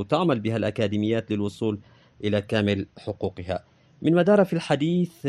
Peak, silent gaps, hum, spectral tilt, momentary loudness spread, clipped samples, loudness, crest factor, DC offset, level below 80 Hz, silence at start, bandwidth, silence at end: -8 dBFS; none; none; -7.5 dB/octave; 12 LU; under 0.1%; -25 LUFS; 18 dB; under 0.1%; -62 dBFS; 0 s; 13 kHz; 0 s